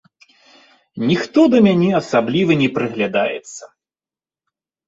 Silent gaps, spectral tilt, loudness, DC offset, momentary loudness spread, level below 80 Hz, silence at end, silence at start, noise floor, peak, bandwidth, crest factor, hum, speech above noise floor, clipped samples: none; -6.5 dB/octave; -16 LUFS; under 0.1%; 18 LU; -60 dBFS; 1.2 s; 0.95 s; under -90 dBFS; -2 dBFS; 8 kHz; 16 dB; none; over 74 dB; under 0.1%